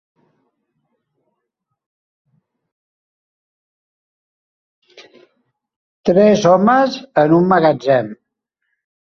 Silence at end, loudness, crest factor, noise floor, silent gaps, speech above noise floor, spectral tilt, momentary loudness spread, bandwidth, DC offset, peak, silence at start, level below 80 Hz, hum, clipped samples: 0.95 s; -13 LUFS; 18 dB; -76 dBFS; none; 64 dB; -6.5 dB/octave; 6 LU; 7 kHz; under 0.1%; 0 dBFS; 6.05 s; -60 dBFS; none; under 0.1%